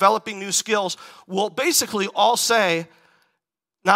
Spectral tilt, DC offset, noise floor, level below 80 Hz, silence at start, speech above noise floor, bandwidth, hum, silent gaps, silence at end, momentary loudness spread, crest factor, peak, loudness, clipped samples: -2 dB/octave; under 0.1%; -80 dBFS; -72 dBFS; 0 s; 59 dB; 16 kHz; none; none; 0 s; 11 LU; 22 dB; 0 dBFS; -21 LUFS; under 0.1%